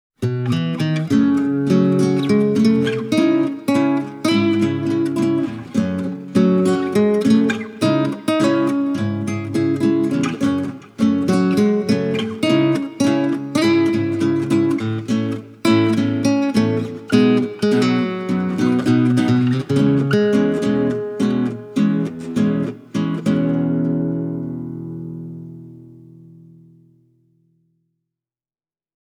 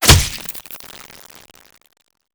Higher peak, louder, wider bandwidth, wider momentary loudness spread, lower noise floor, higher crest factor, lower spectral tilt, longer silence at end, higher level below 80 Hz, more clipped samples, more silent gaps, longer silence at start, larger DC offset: about the same, -2 dBFS vs 0 dBFS; about the same, -18 LUFS vs -16 LUFS; second, 13 kHz vs over 20 kHz; second, 7 LU vs 27 LU; first, under -90 dBFS vs -42 dBFS; about the same, 16 dB vs 20 dB; first, -7 dB/octave vs -2.5 dB/octave; first, 3.15 s vs 1.6 s; second, -58 dBFS vs -28 dBFS; second, under 0.1% vs 0.2%; neither; first, 0.2 s vs 0 s; neither